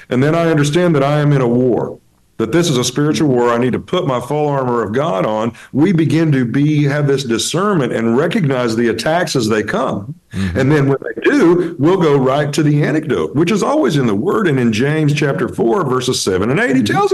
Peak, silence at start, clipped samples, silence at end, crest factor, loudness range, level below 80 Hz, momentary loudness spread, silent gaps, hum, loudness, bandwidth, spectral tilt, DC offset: -4 dBFS; 0 s; under 0.1%; 0 s; 10 dB; 2 LU; -48 dBFS; 4 LU; none; none; -14 LUFS; 12.5 kHz; -6 dB/octave; under 0.1%